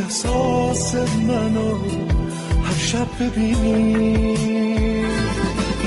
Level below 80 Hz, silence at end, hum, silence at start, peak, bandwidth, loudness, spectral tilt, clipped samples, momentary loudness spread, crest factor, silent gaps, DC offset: -28 dBFS; 0 s; none; 0 s; -10 dBFS; 11.5 kHz; -20 LUFS; -5.5 dB/octave; under 0.1%; 5 LU; 10 dB; none; under 0.1%